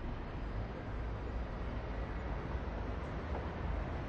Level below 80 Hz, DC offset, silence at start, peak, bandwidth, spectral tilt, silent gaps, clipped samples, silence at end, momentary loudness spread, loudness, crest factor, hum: -42 dBFS; under 0.1%; 0 s; -28 dBFS; 6.8 kHz; -8 dB/octave; none; under 0.1%; 0 s; 2 LU; -42 LUFS; 12 dB; none